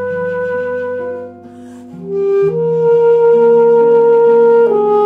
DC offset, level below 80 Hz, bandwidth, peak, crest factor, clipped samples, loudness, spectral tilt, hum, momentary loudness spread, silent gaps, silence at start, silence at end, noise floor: under 0.1%; -58 dBFS; 3.5 kHz; -2 dBFS; 10 dB; under 0.1%; -11 LUFS; -8.5 dB/octave; none; 14 LU; none; 0 s; 0 s; -33 dBFS